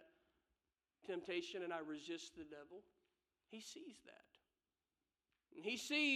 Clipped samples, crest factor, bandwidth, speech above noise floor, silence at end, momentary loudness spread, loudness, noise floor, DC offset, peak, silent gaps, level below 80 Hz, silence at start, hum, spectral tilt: under 0.1%; 22 dB; 13.5 kHz; over 44 dB; 0 s; 18 LU; -47 LUFS; under -90 dBFS; under 0.1%; -28 dBFS; none; -88 dBFS; 0 s; none; -2.5 dB/octave